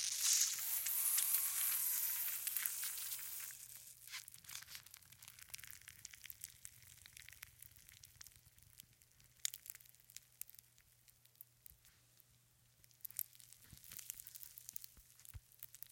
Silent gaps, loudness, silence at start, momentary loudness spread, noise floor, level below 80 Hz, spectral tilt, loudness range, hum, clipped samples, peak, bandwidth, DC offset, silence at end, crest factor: none; -39 LUFS; 0 s; 25 LU; -72 dBFS; -76 dBFS; 2.5 dB/octave; 19 LU; none; under 0.1%; -16 dBFS; 17 kHz; under 0.1%; 0.15 s; 30 dB